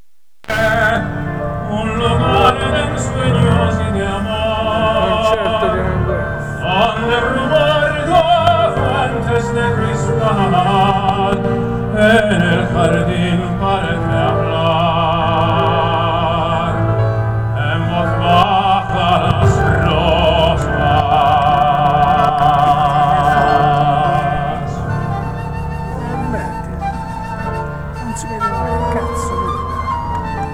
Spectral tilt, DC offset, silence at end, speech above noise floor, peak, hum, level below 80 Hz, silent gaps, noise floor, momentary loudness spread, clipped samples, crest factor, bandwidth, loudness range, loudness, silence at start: -6.5 dB/octave; 0.8%; 0 s; 23 dB; 0 dBFS; none; -28 dBFS; none; -36 dBFS; 9 LU; under 0.1%; 14 dB; 14 kHz; 8 LU; -15 LUFS; 0.5 s